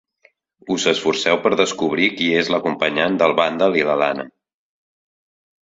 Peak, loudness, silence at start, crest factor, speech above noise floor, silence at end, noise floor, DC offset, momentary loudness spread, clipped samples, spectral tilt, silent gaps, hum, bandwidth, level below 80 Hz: -2 dBFS; -18 LUFS; 0.65 s; 18 dB; 40 dB; 1.45 s; -58 dBFS; under 0.1%; 4 LU; under 0.1%; -4 dB/octave; none; none; 8 kHz; -60 dBFS